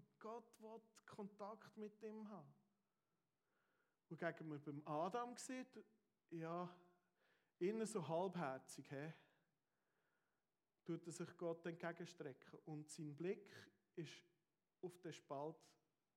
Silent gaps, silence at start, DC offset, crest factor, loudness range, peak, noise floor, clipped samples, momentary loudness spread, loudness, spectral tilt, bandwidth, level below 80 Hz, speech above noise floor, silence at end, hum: none; 0 s; under 0.1%; 22 dB; 7 LU; -30 dBFS; under -90 dBFS; under 0.1%; 16 LU; -52 LUFS; -5.5 dB/octave; 15 kHz; under -90 dBFS; over 39 dB; 0.45 s; none